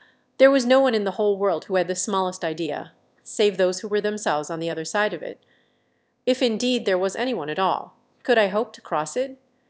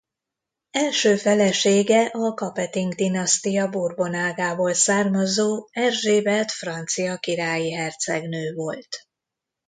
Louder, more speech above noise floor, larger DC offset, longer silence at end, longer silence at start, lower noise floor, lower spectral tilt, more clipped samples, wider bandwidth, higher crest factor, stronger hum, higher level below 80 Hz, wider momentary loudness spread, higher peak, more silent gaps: about the same, -23 LUFS vs -22 LUFS; second, 46 dB vs 63 dB; neither; second, 0.35 s vs 0.7 s; second, 0.4 s vs 0.75 s; second, -68 dBFS vs -85 dBFS; about the same, -4 dB/octave vs -3.5 dB/octave; neither; second, 8 kHz vs 9.6 kHz; about the same, 20 dB vs 16 dB; neither; second, -76 dBFS vs -68 dBFS; about the same, 11 LU vs 10 LU; about the same, -4 dBFS vs -6 dBFS; neither